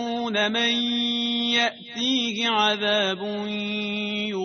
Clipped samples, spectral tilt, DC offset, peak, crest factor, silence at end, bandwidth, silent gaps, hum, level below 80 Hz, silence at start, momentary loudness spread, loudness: under 0.1%; -3 dB/octave; under 0.1%; -8 dBFS; 16 dB; 0 s; 6.6 kHz; none; none; -68 dBFS; 0 s; 6 LU; -23 LUFS